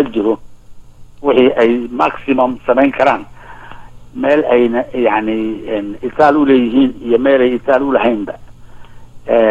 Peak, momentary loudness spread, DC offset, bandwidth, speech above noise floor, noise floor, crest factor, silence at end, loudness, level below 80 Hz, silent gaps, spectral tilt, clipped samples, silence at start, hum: 0 dBFS; 10 LU; under 0.1%; 7.6 kHz; 21 dB; -33 dBFS; 14 dB; 0 s; -13 LUFS; -42 dBFS; none; -7 dB/octave; under 0.1%; 0 s; none